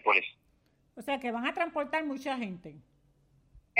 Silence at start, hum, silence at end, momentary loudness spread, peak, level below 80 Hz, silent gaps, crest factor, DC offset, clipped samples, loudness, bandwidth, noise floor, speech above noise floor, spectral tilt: 0.05 s; none; 0 s; 18 LU; -10 dBFS; -68 dBFS; none; 24 dB; under 0.1%; under 0.1%; -33 LUFS; 15.5 kHz; -69 dBFS; 35 dB; -4.5 dB/octave